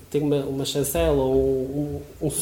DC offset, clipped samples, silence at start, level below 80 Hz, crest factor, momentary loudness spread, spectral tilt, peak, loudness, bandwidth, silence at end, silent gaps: under 0.1%; under 0.1%; 0 s; -38 dBFS; 14 dB; 8 LU; -5.5 dB/octave; -10 dBFS; -24 LUFS; 18 kHz; 0 s; none